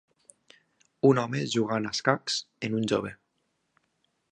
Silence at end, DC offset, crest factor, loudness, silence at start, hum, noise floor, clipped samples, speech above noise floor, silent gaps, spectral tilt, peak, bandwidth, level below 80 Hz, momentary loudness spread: 1.15 s; under 0.1%; 24 dB; -27 LUFS; 1.05 s; none; -76 dBFS; under 0.1%; 49 dB; none; -5 dB/octave; -6 dBFS; 10 kHz; -68 dBFS; 8 LU